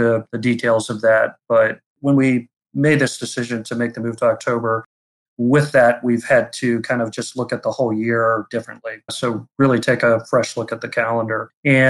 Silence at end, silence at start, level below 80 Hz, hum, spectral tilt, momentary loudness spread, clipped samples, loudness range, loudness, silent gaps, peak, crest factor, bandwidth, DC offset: 0 s; 0 s; -60 dBFS; none; -6 dB/octave; 9 LU; under 0.1%; 3 LU; -19 LUFS; 1.86-1.96 s, 4.86-5.37 s, 11.57-11.63 s; -4 dBFS; 14 dB; 12.5 kHz; under 0.1%